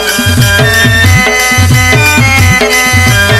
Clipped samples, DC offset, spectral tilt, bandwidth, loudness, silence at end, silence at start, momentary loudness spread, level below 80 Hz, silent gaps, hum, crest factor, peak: 0.4%; under 0.1%; -3.5 dB/octave; 16 kHz; -5 LUFS; 0 s; 0 s; 1 LU; -22 dBFS; none; none; 6 dB; 0 dBFS